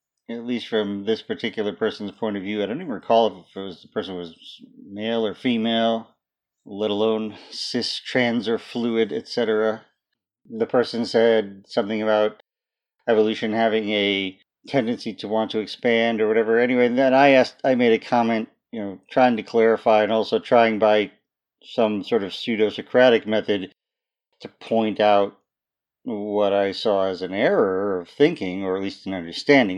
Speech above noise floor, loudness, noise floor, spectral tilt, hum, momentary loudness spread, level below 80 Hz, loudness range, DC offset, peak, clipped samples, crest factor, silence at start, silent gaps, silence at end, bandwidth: 68 dB; -22 LUFS; -89 dBFS; -5.5 dB/octave; none; 13 LU; -72 dBFS; 6 LU; under 0.1%; -2 dBFS; under 0.1%; 20 dB; 0.3 s; none; 0 s; 10 kHz